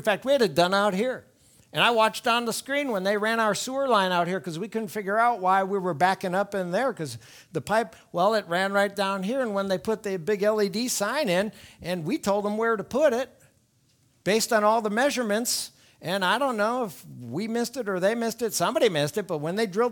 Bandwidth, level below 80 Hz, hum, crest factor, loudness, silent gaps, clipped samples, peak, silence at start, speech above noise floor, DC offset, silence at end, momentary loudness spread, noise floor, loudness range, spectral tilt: 19.5 kHz; -66 dBFS; none; 20 dB; -25 LUFS; none; under 0.1%; -6 dBFS; 0 s; 40 dB; under 0.1%; 0 s; 10 LU; -65 dBFS; 3 LU; -4 dB/octave